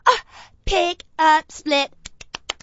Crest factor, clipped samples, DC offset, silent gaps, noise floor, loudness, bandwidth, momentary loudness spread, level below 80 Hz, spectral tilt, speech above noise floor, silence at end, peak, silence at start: 20 dB; under 0.1%; under 0.1%; none; -40 dBFS; -20 LUFS; 8 kHz; 19 LU; -38 dBFS; -2.5 dB/octave; 21 dB; 0.1 s; -2 dBFS; 0.05 s